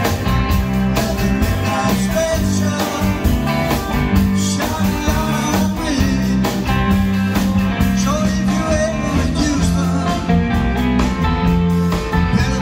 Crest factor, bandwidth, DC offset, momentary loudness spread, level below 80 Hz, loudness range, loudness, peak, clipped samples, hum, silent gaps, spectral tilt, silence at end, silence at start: 14 dB; 16.5 kHz; under 0.1%; 2 LU; -24 dBFS; 1 LU; -17 LUFS; -2 dBFS; under 0.1%; none; none; -5.5 dB/octave; 0 s; 0 s